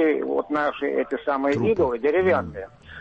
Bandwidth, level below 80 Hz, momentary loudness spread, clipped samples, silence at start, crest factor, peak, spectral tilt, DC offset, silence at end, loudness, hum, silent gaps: 8 kHz; -52 dBFS; 9 LU; under 0.1%; 0 s; 14 dB; -10 dBFS; -7.5 dB/octave; under 0.1%; 0 s; -23 LUFS; none; none